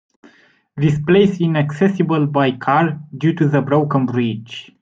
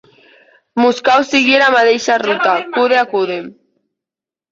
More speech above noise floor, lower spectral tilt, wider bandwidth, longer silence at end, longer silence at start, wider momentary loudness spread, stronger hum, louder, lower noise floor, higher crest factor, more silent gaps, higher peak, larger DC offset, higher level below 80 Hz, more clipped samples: second, 36 dB vs 75 dB; first, -8 dB/octave vs -3 dB/octave; about the same, 7.6 kHz vs 7.8 kHz; second, 0.2 s vs 1 s; about the same, 0.75 s vs 0.75 s; about the same, 7 LU vs 9 LU; neither; second, -17 LUFS vs -13 LUFS; second, -52 dBFS vs -88 dBFS; about the same, 16 dB vs 14 dB; neither; about the same, -2 dBFS vs 0 dBFS; neither; first, -54 dBFS vs -62 dBFS; neither